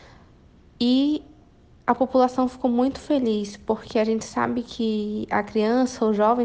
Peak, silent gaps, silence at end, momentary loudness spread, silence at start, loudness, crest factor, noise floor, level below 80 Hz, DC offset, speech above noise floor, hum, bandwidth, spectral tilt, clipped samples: -6 dBFS; none; 0 s; 7 LU; 0.8 s; -23 LUFS; 18 dB; -52 dBFS; -54 dBFS; under 0.1%; 30 dB; none; 9.2 kHz; -5.5 dB/octave; under 0.1%